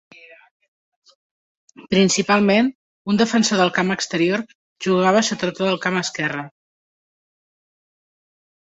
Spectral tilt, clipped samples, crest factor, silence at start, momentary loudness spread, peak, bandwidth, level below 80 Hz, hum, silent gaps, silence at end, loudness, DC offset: -4 dB/octave; under 0.1%; 18 dB; 1.8 s; 10 LU; -2 dBFS; 8.4 kHz; -62 dBFS; none; 2.75-3.05 s, 4.55-4.76 s; 2.2 s; -19 LUFS; under 0.1%